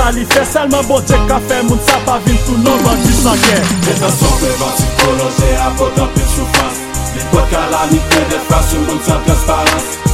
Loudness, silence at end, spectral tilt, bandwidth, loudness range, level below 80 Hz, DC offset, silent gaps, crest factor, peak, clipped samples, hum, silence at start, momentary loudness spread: -12 LUFS; 0 s; -4.5 dB/octave; 16.5 kHz; 2 LU; -18 dBFS; under 0.1%; none; 12 dB; 0 dBFS; under 0.1%; none; 0 s; 3 LU